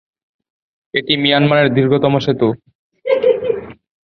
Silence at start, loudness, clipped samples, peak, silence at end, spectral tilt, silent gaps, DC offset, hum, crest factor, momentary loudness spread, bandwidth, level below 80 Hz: 0.95 s; -15 LUFS; under 0.1%; 0 dBFS; 0.3 s; -7.5 dB/octave; 2.75-2.90 s; under 0.1%; none; 16 dB; 10 LU; 6.4 kHz; -54 dBFS